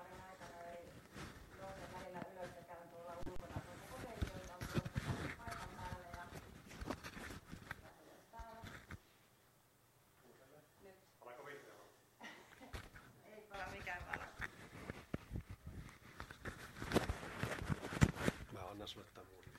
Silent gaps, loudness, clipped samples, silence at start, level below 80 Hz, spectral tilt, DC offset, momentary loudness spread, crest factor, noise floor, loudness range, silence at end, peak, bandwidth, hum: none; -48 LUFS; under 0.1%; 0 s; -58 dBFS; -5.5 dB/octave; under 0.1%; 17 LU; 32 dB; -72 dBFS; 17 LU; 0 s; -16 dBFS; 16 kHz; none